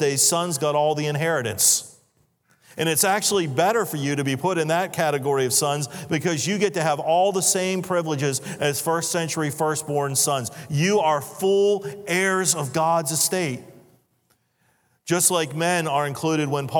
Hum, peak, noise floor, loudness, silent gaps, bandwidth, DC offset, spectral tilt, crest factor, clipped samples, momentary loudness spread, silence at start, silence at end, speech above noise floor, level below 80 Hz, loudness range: none; -4 dBFS; -67 dBFS; -22 LUFS; none; 19.5 kHz; under 0.1%; -3.5 dB/octave; 20 dB; under 0.1%; 7 LU; 0 s; 0 s; 45 dB; -70 dBFS; 2 LU